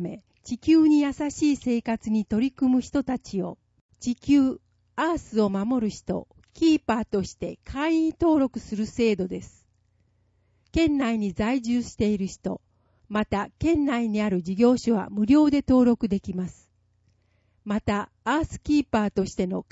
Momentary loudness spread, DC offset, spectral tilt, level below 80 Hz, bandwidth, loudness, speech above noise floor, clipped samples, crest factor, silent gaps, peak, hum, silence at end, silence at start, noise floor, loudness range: 13 LU; under 0.1%; -6.5 dB/octave; -48 dBFS; 8 kHz; -25 LUFS; 43 dB; under 0.1%; 16 dB; 3.81-3.89 s; -8 dBFS; none; 0.1 s; 0 s; -66 dBFS; 5 LU